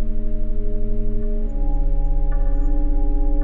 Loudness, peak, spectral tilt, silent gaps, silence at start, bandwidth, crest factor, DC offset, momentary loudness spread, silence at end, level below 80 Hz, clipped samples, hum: -26 LUFS; -8 dBFS; -11.5 dB/octave; none; 0 s; 1.8 kHz; 8 dB; under 0.1%; 4 LU; 0 s; -18 dBFS; under 0.1%; none